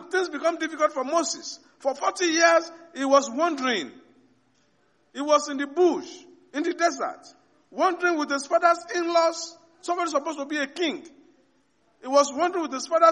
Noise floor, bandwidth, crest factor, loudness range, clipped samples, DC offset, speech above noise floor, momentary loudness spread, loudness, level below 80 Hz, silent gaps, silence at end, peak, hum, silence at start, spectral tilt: -66 dBFS; 11 kHz; 20 dB; 4 LU; under 0.1%; under 0.1%; 42 dB; 15 LU; -24 LUFS; -80 dBFS; none; 0 s; -6 dBFS; none; 0 s; -1.5 dB/octave